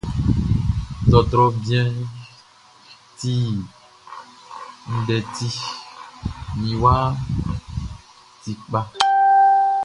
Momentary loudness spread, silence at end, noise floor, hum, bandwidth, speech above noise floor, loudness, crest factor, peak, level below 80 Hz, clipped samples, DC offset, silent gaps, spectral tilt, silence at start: 23 LU; 0 s; -50 dBFS; none; 11 kHz; 30 dB; -20 LUFS; 20 dB; 0 dBFS; -34 dBFS; under 0.1%; under 0.1%; none; -6.5 dB/octave; 0.05 s